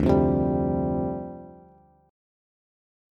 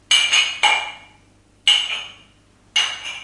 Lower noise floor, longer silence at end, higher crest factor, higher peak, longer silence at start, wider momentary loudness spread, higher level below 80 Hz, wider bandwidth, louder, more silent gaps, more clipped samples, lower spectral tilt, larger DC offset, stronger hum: about the same, -55 dBFS vs -54 dBFS; first, 1.55 s vs 0 s; about the same, 22 dB vs 20 dB; second, -6 dBFS vs -2 dBFS; about the same, 0 s vs 0.1 s; first, 17 LU vs 14 LU; first, -40 dBFS vs -60 dBFS; second, 6.4 kHz vs 11.5 kHz; second, -25 LUFS vs -17 LUFS; neither; neither; first, -10.5 dB/octave vs 3 dB/octave; neither; second, none vs 50 Hz at -60 dBFS